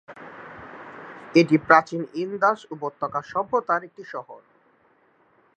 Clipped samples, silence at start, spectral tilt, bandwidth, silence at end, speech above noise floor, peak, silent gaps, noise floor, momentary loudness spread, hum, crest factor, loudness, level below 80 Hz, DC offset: under 0.1%; 0.1 s; -6.5 dB/octave; 8.4 kHz; 1.2 s; 39 dB; -2 dBFS; none; -61 dBFS; 23 LU; none; 24 dB; -22 LUFS; -68 dBFS; under 0.1%